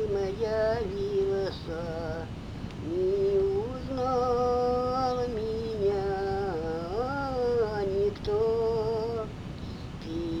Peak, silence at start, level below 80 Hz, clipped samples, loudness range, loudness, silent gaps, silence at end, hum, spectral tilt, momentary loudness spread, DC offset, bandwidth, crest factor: -16 dBFS; 0 s; -44 dBFS; under 0.1%; 2 LU; -30 LUFS; none; 0 s; none; -7 dB/octave; 11 LU; under 0.1%; 9.8 kHz; 12 dB